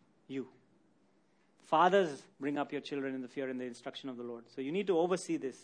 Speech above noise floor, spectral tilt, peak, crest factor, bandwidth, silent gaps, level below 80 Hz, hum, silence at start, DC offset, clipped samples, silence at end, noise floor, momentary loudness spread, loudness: 37 dB; -5 dB/octave; -14 dBFS; 22 dB; 10.5 kHz; none; -86 dBFS; none; 0.3 s; under 0.1%; under 0.1%; 0 s; -71 dBFS; 16 LU; -35 LUFS